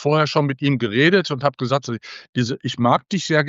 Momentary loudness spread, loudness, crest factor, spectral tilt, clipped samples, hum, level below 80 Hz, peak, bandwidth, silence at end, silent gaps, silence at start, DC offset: 8 LU; -20 LUFS; 18 dB; -5.5 dB/octave; under 0.1%; none; -62 dBFS; -2 dBFS; 7.8 kHz; 0 s; 2.29-2.33 s; 0 s; under 0.1%